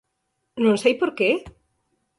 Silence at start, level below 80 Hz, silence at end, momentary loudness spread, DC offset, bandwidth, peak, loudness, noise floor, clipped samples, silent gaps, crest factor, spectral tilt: 0.55 s; -60 dBFS; 0.7 s; 8 LU; under 0.1%; 11.5 kHz; -6 dBFS; -21 LUFS; -75 dBFS; under 0.1%; none; 18 dB; -5 dB/octave